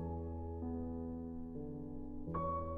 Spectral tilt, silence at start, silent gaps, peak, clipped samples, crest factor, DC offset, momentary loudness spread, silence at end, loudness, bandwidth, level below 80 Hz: -11.5 dB/octave; 0 s; none; -28 dBFS; under 0.1%; 14 dB; under 0.1%; 7 LU; 0 s; -44 LUFS; 3.6 kHz; -54 dBFS